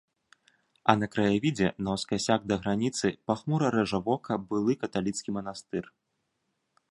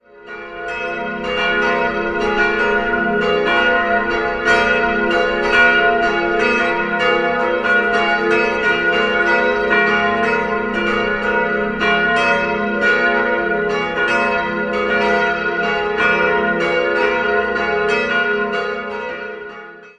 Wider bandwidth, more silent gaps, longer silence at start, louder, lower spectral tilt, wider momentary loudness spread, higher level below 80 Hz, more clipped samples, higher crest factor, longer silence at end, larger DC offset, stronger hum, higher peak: first, 11.5 kHz vs 10 kHz; neither; first, 0.85 s vs 0.15 s; second, -29 LUFS vs -16 LUFS; about the same, -5.5 dB/octave vs -4.5 dB/octave; about the same, 9 LU vs 8 LU; second, -60 dBFS vs -42 dBFS; neither; first, 28 dB vs 16 dB; first, 1 s vs 0.1 s; neither; neither; about the same, -2 dBFS vs 0 dBFS